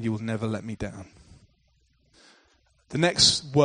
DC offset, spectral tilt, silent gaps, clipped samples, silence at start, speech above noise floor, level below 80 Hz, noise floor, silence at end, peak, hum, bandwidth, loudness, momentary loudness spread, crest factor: under 0.1%; -3.5 dB/octave; none; under 0.1%; 0 s; 41 dB; -52 dBFS; -66 dBFS; 0 s; -6 dBFS; none; 10 kHz; -24 LUFS; 18 LU; 22 dB